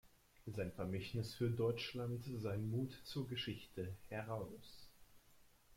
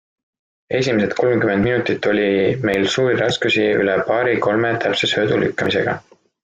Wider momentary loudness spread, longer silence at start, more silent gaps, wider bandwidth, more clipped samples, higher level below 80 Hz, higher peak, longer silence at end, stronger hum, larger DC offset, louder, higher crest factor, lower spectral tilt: first, 11 LU vs 2 LU; second, 0.05 s vs 0.7 s; neither; first, 16.5 kHz vs 9.2 kHz; neither; second, -68 dBFS vs -52 dBFS; second, -28 dBFS vs -4 dBFS; second, 0 s vs 0.45 s; neither; neither; second, -44 LUFS vs -18 LUFS; about the same, 16 dB vs 14 dB; about the same, -6.5 dB/octave vs -5.5 dB/octave